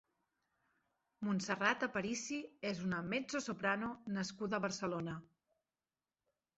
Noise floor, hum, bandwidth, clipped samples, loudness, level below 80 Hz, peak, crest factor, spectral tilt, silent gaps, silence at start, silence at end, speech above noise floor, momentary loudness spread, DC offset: under -90 dBFS; none; 8 kHz; under 0.1%; -39 LUFS; -74 dBFS; -18 dBFS; 24 dB; -4 dB/octave; none; 1.2 s; 1.3 s; over 51 dB; 8 LU; under 0.1%